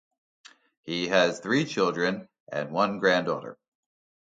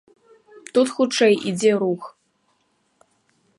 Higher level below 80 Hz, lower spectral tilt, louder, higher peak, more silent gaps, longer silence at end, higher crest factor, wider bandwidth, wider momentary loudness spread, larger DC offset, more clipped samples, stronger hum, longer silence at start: about the same, -70 dBFS vs -74 dBFS; about the same, -4.5 dB/octave vs -4.5 dB/octave; second, -26 LUFS vs -20 LUFS; about the same, -6 dBFS vs -6 dBFS; first, 2.40-2.47 s vs none; second, 0.75 s vs 1.5 s; about the same, 22 dB vs 18 dB; second, 9.2 kHz vs 11.5 kHz; first, 13 LU vs 10 LU; neither; neither; neither; first, 0.85 s vs 0.55 s